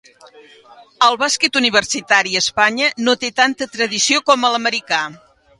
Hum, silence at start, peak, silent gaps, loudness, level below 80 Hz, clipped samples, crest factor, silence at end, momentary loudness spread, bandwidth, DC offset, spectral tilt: none; 0.35 s; 0 dBFS; none; -15 LUFS; -60 dBFS; under 0.1%; 18 dB; 0.45 s; 6 LU; 11.5 kHz; under 0.1%; -1 dB/octave